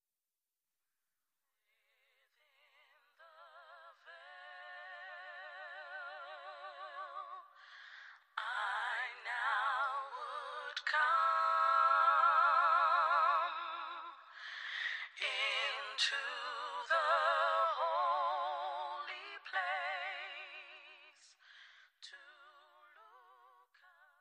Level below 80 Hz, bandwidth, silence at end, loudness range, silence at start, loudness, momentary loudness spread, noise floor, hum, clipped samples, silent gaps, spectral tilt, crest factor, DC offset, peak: under -90 dBFS; 10.5 kHz; 1.05 s; 19 LU; 3.2 s; -34 LUFS; 24 LU; under -90 dBFS; none; under 0.1%; none; 3 dB/octave; 20 dB; under 0.1%; -20 dBFS